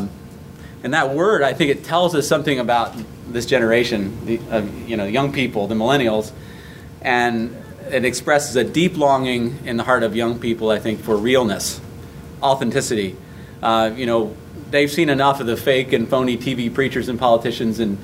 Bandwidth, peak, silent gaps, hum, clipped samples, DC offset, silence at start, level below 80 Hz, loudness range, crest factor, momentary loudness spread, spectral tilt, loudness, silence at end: 16 kHz; -2 dBFS; none; none; under 0.1%; under 0.1%; 0 s; -46 dBFS; 2 LU; 18 dB; 15 LU; -5 dB/octave; -19 LUFS; 0 s